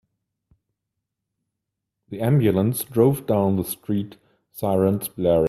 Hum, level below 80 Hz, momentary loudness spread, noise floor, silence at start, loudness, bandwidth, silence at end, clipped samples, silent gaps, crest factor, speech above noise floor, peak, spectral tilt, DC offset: none; -54 dBFS; 9 LU; -82 dBFS; 2.1 s; -22 LUFS; 16 kHz; 0 s; under 0.1%; none; 18 dB; 62 dB; -4 dBFS; -7 dB/octave; under 0.1%